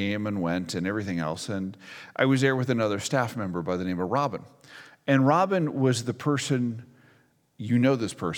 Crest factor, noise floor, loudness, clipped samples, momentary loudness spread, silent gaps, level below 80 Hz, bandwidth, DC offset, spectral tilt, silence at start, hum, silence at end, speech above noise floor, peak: 20 dB; -62 dBFS; -26 LUFS; under 0.1%; 11 LU; none; -64 dBFS; 16.5 kHz; under 0.1%; -6 dB/octave; 0 s; none; 0 s; 36 dB; -6 dBFS